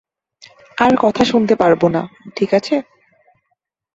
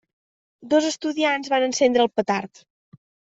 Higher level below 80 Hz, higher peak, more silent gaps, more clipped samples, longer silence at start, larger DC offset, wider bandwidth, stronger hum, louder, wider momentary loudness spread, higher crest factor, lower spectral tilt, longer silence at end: first, -52 dBFS vs -68 dBFS; first, 0 dBFS vs -6 dBFS; neither; neither; first, 0.75 s vs 0.6 s; neither; about the same, 8 kHz vs 8 kHz; neither; first, -15 LUFS vs -21 LUFS; about the same, 9 LU vs 7 LU; about the same, 18 dB vs 18 dB; first, -6 dB/octave vs -3 dB/octave; first, 1.15 s vs 0.9 s